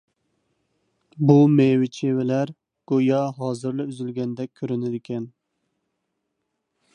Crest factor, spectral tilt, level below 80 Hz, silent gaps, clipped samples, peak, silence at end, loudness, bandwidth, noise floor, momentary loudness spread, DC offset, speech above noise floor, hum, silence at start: 20 dB; -8.5 dB/octave; -70 dBFS; none; under 0.1%; -4 dBFS; 1.65 s; -22 LUFS; 10 kHz; -78 dBFS; 15 LU; under 0.1%; 57 dB; none; 1.15 s